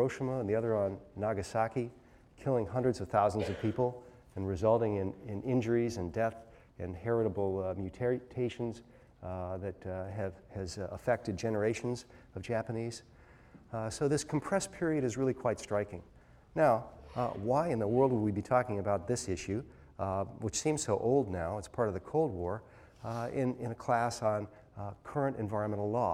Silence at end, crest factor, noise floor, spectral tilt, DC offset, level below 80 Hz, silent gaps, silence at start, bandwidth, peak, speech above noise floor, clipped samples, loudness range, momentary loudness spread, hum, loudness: 0 s; 20 dB; -57 dBFS; -6 dB/octave; under 0.1%; -60 dBFS; none; 0 s; 14.5 kHz; -14 dBFS; 24 dB; under 0.1%; 5 LU; 12 LU; none; -34 LUFS